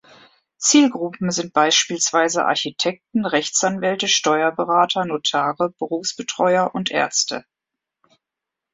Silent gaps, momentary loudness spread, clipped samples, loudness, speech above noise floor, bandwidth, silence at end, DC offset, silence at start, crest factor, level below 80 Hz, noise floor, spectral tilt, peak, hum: none; 9 LU; under 0.1%; -19 LUFS; 65 dB; 8.4 kHz; 1.35 s; under 0.1%; 0.6 s; 18 dB; -66 dBFS; -85 dBFS; -2.5 dB/octave; -2 dBFS; none